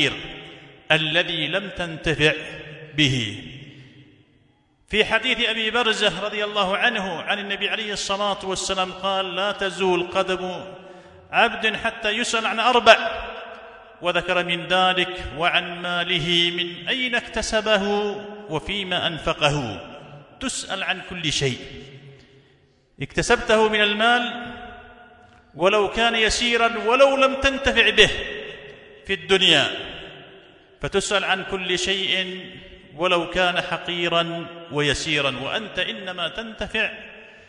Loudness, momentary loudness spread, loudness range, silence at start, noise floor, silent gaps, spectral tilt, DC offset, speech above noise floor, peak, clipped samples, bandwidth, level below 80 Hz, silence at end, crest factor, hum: -21 LUFS; 17 LU; 6 LU; 0 s; -60 dBFS; none; -3 dB/octave; under 0.1%; 39 dB; 0 dBFS; under 0.1%; 11 kHz; -46 dBFS; 0.1 s; 24 dB; none